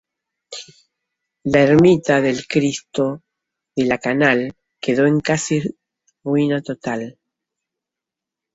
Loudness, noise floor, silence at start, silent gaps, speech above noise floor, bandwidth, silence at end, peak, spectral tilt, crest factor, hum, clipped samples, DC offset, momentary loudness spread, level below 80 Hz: -18 LUFS; -86 dBFS; 0.5 s; none; 69 dB; 8 kHz; 1.45 s; -2 dBFS; -5.5 dB/octave; 18 dB; none; under 0.1%; under 0.1%; 19 LU; -54 dBFS